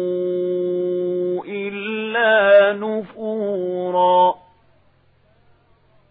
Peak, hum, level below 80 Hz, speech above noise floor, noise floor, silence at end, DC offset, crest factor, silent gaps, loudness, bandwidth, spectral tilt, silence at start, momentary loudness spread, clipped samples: -2 dBFS; none; -68 dBFS; 38 dB; -57 dBFS; 1.75 s; under 0.1%; 18 dB; none; -19 LUFS; 4 kHz; -10 dB/octave; 0 s; 13 LU; under 0.1%